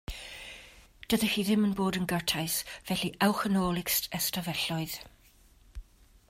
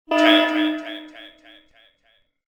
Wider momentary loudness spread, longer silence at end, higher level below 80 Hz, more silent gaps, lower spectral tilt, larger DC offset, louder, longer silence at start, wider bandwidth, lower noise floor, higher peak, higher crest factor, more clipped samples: second, 15 LU vs 21 LU; second, 0.45 s vs 1.2 s; first, -52 dBFS vs -70 dBFS; neither; first, -4 dB/octave vs -2 dB/octave; neither; second, -29 LUFS vs -18 LUFS; about the same, 0.1 s vs 0.1 s; second, 16 kHz vs over 20 kHz; second, -60 dBFS vs -64 dBFS; second, -12 dBFS vs -4 dBFS; about the same, 18 dB vs 20 dB; neither